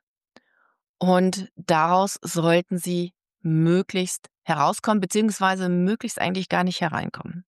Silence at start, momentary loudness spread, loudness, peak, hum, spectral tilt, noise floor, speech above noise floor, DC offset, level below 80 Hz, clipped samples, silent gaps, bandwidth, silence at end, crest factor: 1 s; 9 LU; -23 LUFS; -8 dBFS; none; -5.5 dB/octave; -59 dBFS; 37 dB; under 0.1%; -68 dBFS; under 0.1%; 4.38-4.42 s; 12.5 kHz; 0.05 s; 16 dB